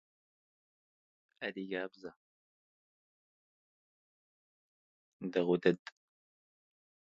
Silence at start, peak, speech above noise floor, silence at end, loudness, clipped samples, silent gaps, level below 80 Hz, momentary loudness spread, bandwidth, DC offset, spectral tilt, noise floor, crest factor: 1.4 s; -14 dBFS; over 55 dB; 1.45 s; -36 LUFS; under 0.1%; 2.16-5.20 s; -84 dBFS; 22 LU; 7.4 kHz; under 0.1%; -5 dB/octave; under -90 dBFS; 28 dB